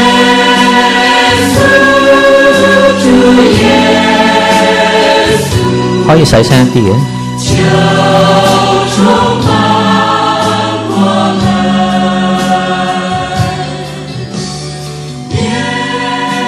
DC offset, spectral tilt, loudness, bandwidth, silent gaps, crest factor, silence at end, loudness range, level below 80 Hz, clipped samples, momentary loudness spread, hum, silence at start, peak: under 0.1%; -5 dB/octave; -8 LUFS; 15.5 kHz; none; 8 dB; 0 s; 8 LU; -32 dBFS; 1%; 10 LU; none; 0 s; 0 dBFS